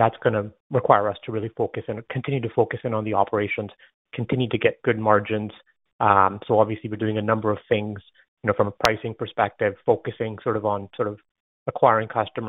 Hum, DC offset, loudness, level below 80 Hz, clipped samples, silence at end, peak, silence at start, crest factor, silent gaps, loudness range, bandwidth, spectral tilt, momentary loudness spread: none; under 0.1%; -23 LUFS; -58 dBFS; under 0.1%; 0 s; 0 dBFS; 0 s; 24 dB; 0.60-0.70 s, 3.94-4.05 s, 5.93-5.99 s, 8.28-8.37 s, 11.31-11.66 s; 3 LU; 8 kHz; -5 dB/octave; 11 LU